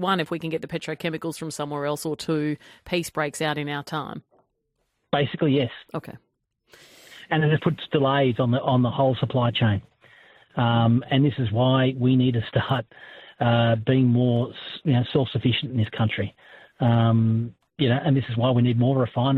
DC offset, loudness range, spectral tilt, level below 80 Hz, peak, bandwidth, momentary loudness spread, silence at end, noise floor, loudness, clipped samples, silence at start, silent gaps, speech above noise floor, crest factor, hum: under 0.1%; 6 LU; -7 dB/octave; -58 dBFS; -6 dBFS; 12.5 kHz; 11 LU; 0 s; -74 dBFS; -23 LUFS; under 0.1%; 0 s; none; 52 dB; 16 dB; none